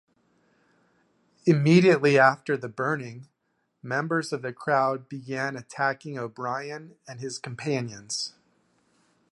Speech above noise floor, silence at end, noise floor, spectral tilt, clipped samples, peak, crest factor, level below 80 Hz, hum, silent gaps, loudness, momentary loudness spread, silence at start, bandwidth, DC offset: 50 dB; 1 s; -75 dBFS; -5.5 dB/octave; under 0.1%; -4 dBFS; 22 dB; -72 dBFS; none; none; -25 LUFS; 18 LU; 1.45 s; 11.5 kHz; under 0.1%